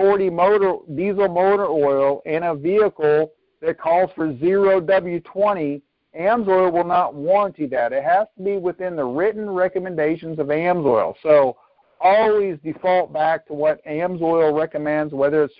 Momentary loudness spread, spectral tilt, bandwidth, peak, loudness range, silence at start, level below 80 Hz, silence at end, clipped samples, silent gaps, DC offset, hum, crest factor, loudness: 8 LU; -11.5 dB/octave; 5.2 kHz; -4 dBFS; 2 LU; 0 s; -58 dBFS; 0.1 s; under 0.1%; none; under 0.1%; none; 16 dB; -19 LUFS